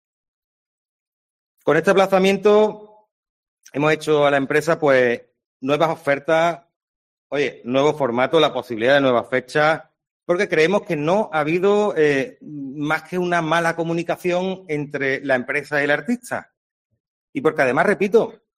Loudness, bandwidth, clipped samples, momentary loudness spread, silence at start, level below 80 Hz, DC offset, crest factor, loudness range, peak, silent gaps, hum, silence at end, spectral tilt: -19 LUFS; 14 kHz; under 0.1%; 10 LU; 1.65 s; -64 dBFS; under 0.1%; 18 dB; 3 LU; -2 dBFS; 3.11-3.23 s, 3.29-3.57 s, 5.46-5.60 s, 6.76-7.30 s, 10.11-10.20 s, 16.57-16.90 s, 17.00-17.33 s; none; 0.25 s; -5.5 dB/octave